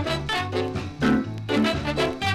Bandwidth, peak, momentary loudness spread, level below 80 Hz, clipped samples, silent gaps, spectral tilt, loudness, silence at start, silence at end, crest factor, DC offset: 14.5 kHz; -10 dBFS; 4 LU; -42 dBFS; under 0.1%; none; -5.5 dB/octave; -25 LUFS; 0 s; 0 s; 14 dB; under 0.1%